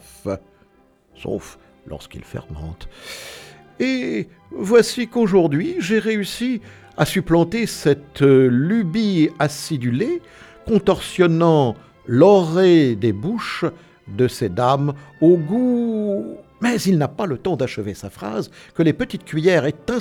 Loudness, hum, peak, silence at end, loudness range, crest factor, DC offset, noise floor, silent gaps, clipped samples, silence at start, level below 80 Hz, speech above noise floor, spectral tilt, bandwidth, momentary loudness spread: -19 LUFS; none; -2 dBFS; 0 s; 11 LU; 18 dB; under 0.1%; -56 dBFS; none; under 0.1%; 0.25 s; -48 dBFS; 38 dB; -6.5 dB/octave; 17 kHz; 19 LU